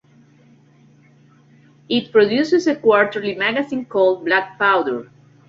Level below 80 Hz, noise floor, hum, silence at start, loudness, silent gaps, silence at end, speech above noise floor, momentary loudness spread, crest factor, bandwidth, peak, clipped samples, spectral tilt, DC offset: -64 dBFS; -51 dBFS; none; 1.9 s; -18 LUFS; none; 0.45 s; 34 dB; 7 LU; 18 dB; 7.6 kHz; -2 dBFS; under 0.1%; -5 dB/octave; under 0.1%